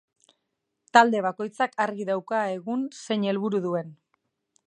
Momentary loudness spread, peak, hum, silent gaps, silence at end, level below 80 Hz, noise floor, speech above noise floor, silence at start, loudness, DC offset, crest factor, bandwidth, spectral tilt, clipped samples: 11 LU; -2 dBFS; none; none; 0.75 s; -80 dBFS; -80 dBFS; 55 dB; 0.95 s; -25 LUFS; under 0.1%; 24 dB; 10.5 kHz; -5 dB/octave; under 0.1%